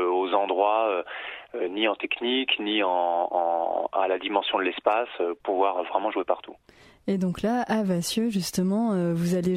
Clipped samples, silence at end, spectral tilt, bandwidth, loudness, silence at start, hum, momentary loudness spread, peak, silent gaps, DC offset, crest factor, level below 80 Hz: under 0.1%; 0 s; -5 dB/octave; 16 kHz; -26 LUFS; 0 s; none; 6 LU; -8 dBFS; none; under 0.1%; 18 dB; -62 dBFS